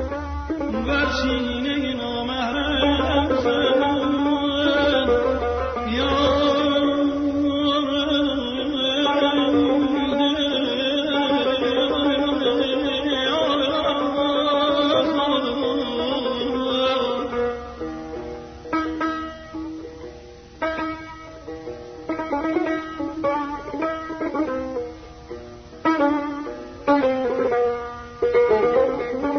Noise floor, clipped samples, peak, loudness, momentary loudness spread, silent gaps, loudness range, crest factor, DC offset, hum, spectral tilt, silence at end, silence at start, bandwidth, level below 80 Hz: -42 dBFS; under 0.1%; -8 dBFS; -22 LUFS; 14 LU; none; 8 LU; 14 dB; under 0.1%; none; -5.5 dB/octave; 0 s; 0 s; 6.6 kHz; -40 dBFS